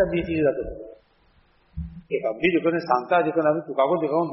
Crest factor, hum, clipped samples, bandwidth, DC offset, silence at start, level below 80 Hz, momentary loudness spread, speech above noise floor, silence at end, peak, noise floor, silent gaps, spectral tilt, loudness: 18 dB; none; under 0.1%; 5.8 kHz; under 0.1%; 0 s; -46 dBFS; 17 LU; 38 dB; 0 s; -6 dBFS; -60 dBFS; none; -5 dB/octave; -23 LUFS